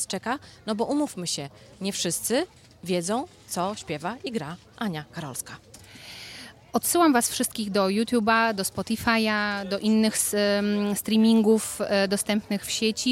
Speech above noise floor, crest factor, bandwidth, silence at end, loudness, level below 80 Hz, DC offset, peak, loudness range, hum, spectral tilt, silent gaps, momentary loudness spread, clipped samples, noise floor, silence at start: 19 dB; 18 dB; 16.5 kHz; 0 s; -25 LUFS; -60 dBFS; under 0.1%; -8 dBFS; 8 LU; none; -3.5 dB/octave; none; 15 LU; under 0.1%; -45 dBFS; 0 s